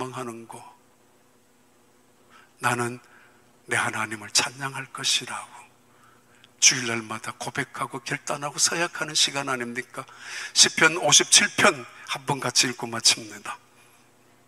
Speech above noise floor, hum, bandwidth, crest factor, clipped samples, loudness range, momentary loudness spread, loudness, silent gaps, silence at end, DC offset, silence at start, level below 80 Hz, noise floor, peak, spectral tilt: 36 dB; none; 16 kHz; 26 dB; under 0.1%; 11 LU; 20 LU; -22 LUFS; none; 0.9 s; under 0.1%; 0 s; -74 dBFS; -61 dBFS; 0 dBFS; -1 dB/octave